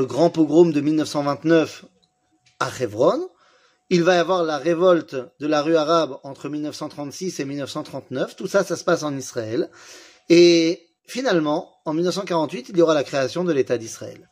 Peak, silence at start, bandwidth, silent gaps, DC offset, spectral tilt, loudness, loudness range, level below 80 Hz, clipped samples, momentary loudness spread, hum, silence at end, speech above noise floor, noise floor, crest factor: -4 dBFS; 0 s; 15 kHz; none; under 0.1%; -5.5 dB/octave; -21 LUFS; 6 LU; -70 dBFS; under 0.1%; 14 LU; none; 0.15 s; 44 dB; -64 dBFS; 18 dB